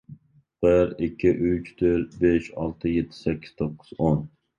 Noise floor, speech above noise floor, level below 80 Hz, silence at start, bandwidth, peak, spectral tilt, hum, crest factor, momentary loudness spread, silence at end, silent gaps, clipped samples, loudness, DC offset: -50 dBFS; 27 dB; -44 dBFS; 0.1 s; 7.4 kHz; -8 dBFS; -9 dB/octave; none; 18 dB; 9 LU; 0.3 s; none; under 0.1%; -25 LUFS; under 0.1%